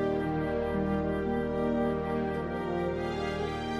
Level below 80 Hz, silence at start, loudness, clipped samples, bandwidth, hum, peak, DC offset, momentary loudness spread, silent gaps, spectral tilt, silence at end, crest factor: -48 dBFS; 0 s; -31 LUFS; under 0.1%; 12.5 kHz; none; -20 dBFS; under 0.1%; 3 LU; none; -7.5 dB/octave; 0 s; 12 dB